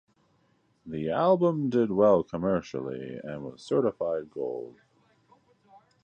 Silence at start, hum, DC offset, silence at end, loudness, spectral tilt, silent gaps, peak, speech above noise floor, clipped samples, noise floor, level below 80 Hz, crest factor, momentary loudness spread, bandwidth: 0.85 s; none; under 0.1%; 1.3 s; -27 LUFS; -8 dB/octave; none; -10 dBFS; 41 dB; under 0.1%; -68 dBFS; -62 dBFS; 20 dB; 16 LU; 9 kHz